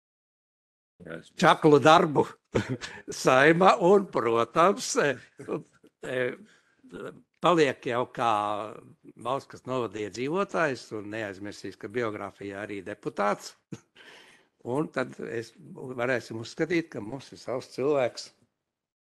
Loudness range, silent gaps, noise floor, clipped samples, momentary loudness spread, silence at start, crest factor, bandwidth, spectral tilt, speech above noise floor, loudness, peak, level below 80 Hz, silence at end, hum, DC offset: 12 LU; none; -76 dBFS; under 0.1%; 22 LU; 1 s; 24 dB; 12.5 kHz; -5 dB/octave; 49 dB; -26 LUFS; -4 dBFS; -66 dBFS; 0.75 s; none; under 0.1%